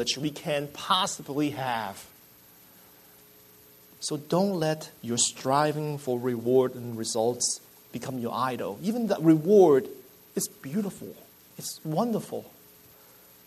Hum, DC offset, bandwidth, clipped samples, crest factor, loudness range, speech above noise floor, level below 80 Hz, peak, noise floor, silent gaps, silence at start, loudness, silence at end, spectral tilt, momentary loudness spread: none; under 0.1%; 13.5 kHz; under 0.1%; 20 dB; 9 LU; 28 dB; -70 dBFS; -8 dBFS; -55 dBFS; none; 0 s; -27 LUFS; 1 s; -4.5 dB/octave; 15 LU